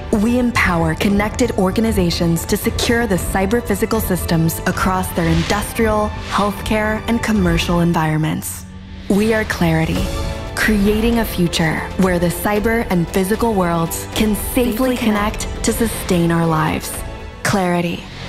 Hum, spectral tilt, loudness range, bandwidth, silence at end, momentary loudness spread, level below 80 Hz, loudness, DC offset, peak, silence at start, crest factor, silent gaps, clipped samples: none; -5.5 dB/octave; 1 LU; 16 kHz; 0 s; 5 LU; -30 dBFS; -17 LUFS; 0.2%; -4 dBFS; 0 s; 14 dB; none; under 0.1%